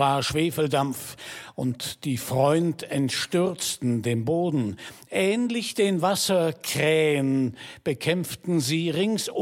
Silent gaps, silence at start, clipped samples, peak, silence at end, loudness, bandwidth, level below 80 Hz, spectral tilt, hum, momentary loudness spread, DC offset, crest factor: none; 0 s; under 0.1%; -8 dBFS; 0 s; -25 LUFS; 17 kHz; -60 dBFS; -5 dB/octave; none; 9 LU; under 0.1%; 18 dB